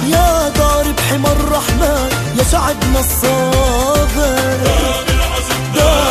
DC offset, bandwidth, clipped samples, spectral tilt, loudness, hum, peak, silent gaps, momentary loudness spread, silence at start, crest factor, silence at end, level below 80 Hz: under 0.1%; 15 kHz; under 0.1%; -4 dB/octave; -13 LUFS; none; 0 dBFS; none; 3 LU; 0 s; 12 dB; 0 s; -18 dBFS